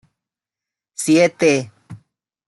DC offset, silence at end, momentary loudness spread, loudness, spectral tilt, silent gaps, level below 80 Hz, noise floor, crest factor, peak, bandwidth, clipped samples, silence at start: under 0.1%; 0.5 s; 20 LU; -16 LUFS; -4.5 dB/octave; none; -66 dBFS; -88 dBFS; 18 dB; -2 dBFS; 12 kHz; under 0.1%; 1 s